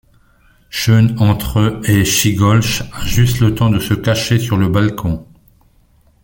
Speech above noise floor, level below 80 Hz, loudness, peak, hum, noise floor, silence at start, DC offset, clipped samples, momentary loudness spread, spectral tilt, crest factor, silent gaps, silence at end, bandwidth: 39 dB; -32 dBFS; -14 LUFS; -2 dBFS; none; -52 dBFS; 0.75 s; under 0.1%; under 0.1%; 7 LU; -5 dB/octave; 14 dB; none; 1 s; 17 kHz